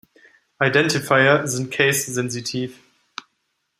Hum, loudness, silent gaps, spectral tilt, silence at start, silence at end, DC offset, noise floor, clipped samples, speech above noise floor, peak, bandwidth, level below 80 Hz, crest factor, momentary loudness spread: none; -19 LUFS; none; -3.5 dB/octave; 0.6 s; 1.05 s; under 0.1%; -73 dBFS; under 0.1%; 53 dB; -2 dBFS; 15.5 kHz; -62 dBFS; 20 dB; 22 LU